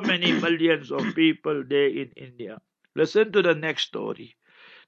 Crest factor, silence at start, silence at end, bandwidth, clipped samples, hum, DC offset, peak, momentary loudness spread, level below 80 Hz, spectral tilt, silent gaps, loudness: 18 dB; 0 s; 0.6 s; 7.6 kHz; under 0.1%; none; under 0.1%; -6 dBFS; 18 LU; -76 dBFS; -5.5 dB/octave; none; -23 LUFS